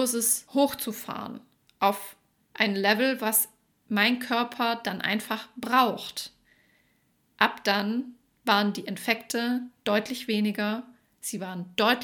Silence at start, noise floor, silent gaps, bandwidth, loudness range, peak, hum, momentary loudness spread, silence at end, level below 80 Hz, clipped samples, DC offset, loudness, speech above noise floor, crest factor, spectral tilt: 0 s; -69 dBFS; none; 19 kHz; 3 LU; -4 dBFS; none; 13 LU; 0 s; -72 dBFS; under 0.1%; under 0.1%; -27 LUFS; 42 dB; 24 dB; -3 dB/octave